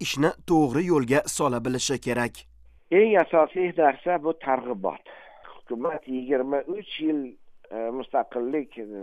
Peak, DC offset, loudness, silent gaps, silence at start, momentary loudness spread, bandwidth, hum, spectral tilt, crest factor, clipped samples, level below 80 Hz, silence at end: -6 dBFS; under 0.1%; -25 LUFS; none; 0 s; 11 LU; 15 kHz; none; -5 dB/octave; 18 dB; under 0.1%; -58 dBFS; 0 s